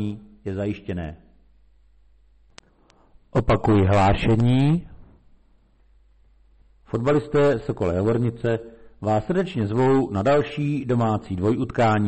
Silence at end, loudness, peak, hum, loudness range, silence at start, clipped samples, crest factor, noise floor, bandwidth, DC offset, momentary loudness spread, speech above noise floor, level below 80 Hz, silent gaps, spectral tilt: 0 s; -22 LUFS; -12 dBFS; none; 5 LU; 0 s; under 0.1%; 12 dB; -57 dBFS; 8.4 kHz; under 0.1%; 12 LU; 36 dB; -40 dBFS; none; -8 dB/octave